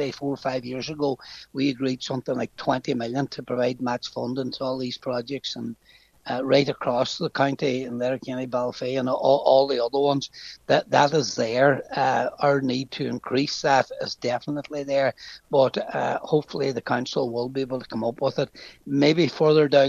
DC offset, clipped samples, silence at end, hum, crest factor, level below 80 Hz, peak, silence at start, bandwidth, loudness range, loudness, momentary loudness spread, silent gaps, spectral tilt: under 0.1%; under 0.1%; 0 s; none; 20 dB; -64 dBFS; -4 dBFS; 0 s; 7.6 kHz; 5 LU; -24 LUFS; 10 LU; none; -5.5 dB/octave